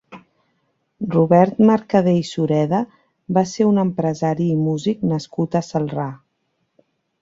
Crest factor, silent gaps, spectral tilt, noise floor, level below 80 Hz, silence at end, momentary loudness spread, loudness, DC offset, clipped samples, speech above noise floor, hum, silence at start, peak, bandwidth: 18 dB; none; -7.5 dB/octave; -70 dBFS; -58 dBFS; 1.05 s; 9 LU; -19 LUFS; under 0.1%; under 0.1%; 53 dB; none; 0.1 s; -2 dBFS; 7.8 kHz